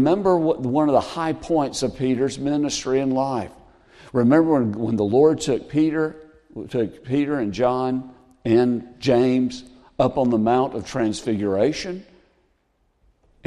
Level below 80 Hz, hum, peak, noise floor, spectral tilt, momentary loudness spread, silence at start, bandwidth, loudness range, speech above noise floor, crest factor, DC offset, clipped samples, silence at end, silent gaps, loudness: -52 dBFS; none; -4 dBFS; -66 dBFS; -6 dB/octave; 11 LU; 0 s; 12 kHz; 3 LU; 46 dB; 16 dB; under 0.1%; under 0.1%; 1.45 s; none; -21 LUFS